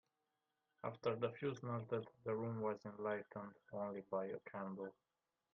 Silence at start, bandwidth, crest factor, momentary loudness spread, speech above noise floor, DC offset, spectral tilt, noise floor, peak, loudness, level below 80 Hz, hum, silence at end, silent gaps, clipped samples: 0.85 s; 5.8 kHz; 20 dB; 9 LU; 44 dB; under 0.1%; -6.5 dB/octave; -89 dBFS; -26 dBFS; -46 LUFS; -86 dBFS; none; 0.6 s; none; under 0.1%